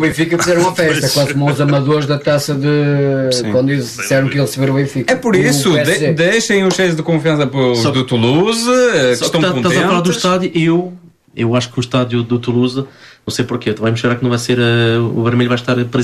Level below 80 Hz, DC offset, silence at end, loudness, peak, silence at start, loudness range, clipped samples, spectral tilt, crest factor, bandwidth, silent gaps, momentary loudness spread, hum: -50 dBFS; under 0.1%; 0 s; -14 LUFS; -2 dBFS; 0 s; 4 LU; under 0.1%; -5 dB/octave; 12 dB; 14 kHz; none; 5 LU; none